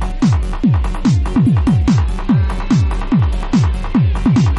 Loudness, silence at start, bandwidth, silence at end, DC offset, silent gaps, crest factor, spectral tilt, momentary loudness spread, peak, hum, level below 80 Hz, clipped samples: -15 LUFS; 0 s; 11.5 kHz; 0 s; 0.3%; none; 10 dB; -7.5 dB/octave; 3 LU; -4 dBFS; none; -20 dBFS; under 0.1%